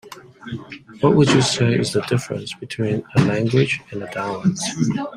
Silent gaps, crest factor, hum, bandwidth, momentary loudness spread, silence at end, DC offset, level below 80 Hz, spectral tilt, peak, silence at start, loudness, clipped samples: none; 18 dB; none; 13 kHz; 17 LU; 0 s; under 0.1%; -52 dBFS; -5.5 dB/octave; -2 dBFS; 0.05 s; -20 LUFS; under 0.1%